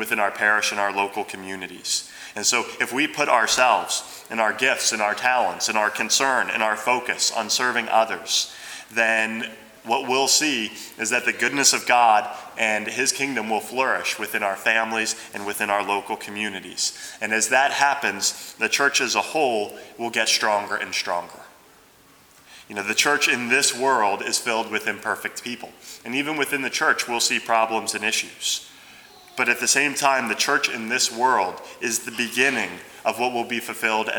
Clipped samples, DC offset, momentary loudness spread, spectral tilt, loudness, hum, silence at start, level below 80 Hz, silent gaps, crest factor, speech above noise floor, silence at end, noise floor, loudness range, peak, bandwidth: under 0.1%; under 0.1%; 11 LU; -0.5 dB/octave; -21 LUFS; none; 0 s; -70 dBFS; none; 20 dB; 30 dB; 0 s; -53 dBFS; 3 LU; -2 dBFS; over 20 kHz